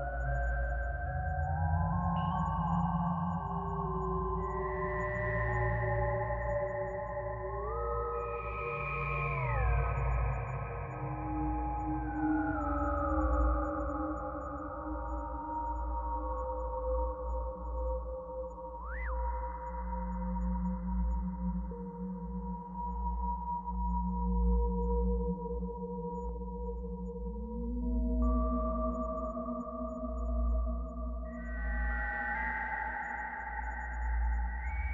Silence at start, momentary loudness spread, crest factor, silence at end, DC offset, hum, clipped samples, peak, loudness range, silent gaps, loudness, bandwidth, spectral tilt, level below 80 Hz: 0 s; 8 LU; 14 dB; 0 s; under 0.1%; none; under 0.1%; -20 dBFS; 4 LU; none; -36 LUFS; 3.2 kHz; -10 dB/octave; -38 dBFS